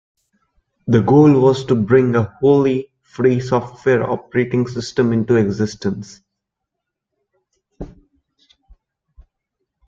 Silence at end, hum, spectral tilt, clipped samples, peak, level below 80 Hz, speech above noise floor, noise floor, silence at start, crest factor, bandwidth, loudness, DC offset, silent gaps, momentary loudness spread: 2 s; none; -7.5 dB/octave; under 0.1%; 0 dBFS; -50 dBFS; 65 dB; -80 dBFS; 0.85 s; 18 dB; 7.6 kHz; -16 LUFS; under 0.1%; none; 21 LU